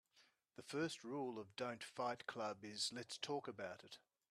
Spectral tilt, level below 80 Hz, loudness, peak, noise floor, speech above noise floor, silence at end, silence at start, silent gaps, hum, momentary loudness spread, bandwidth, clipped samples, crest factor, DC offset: -3.5 dB/octave; -90 dBFS; -47 LUFS; -30 dBFS; -76 dBFS; 29 dB; 0.3 s; 0.15 s; none; none; 14 LU; 13.5 kHz; under 0.1%; 18 dB; under 0.1%